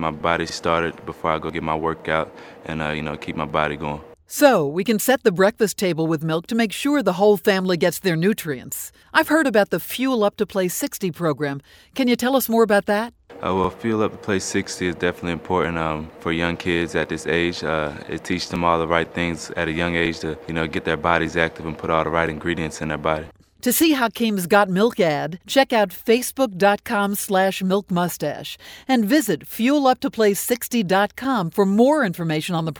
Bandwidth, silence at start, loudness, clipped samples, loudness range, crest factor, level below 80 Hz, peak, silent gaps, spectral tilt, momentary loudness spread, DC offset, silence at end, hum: over 20 kHz; 0 s; -21 LUFS; under 0.1%; 4 LU; 20 dB; -48 dBFS; 0 dBFS; none; -4.5 dB/octave; 10 LU; under 0.1%; 0 s; none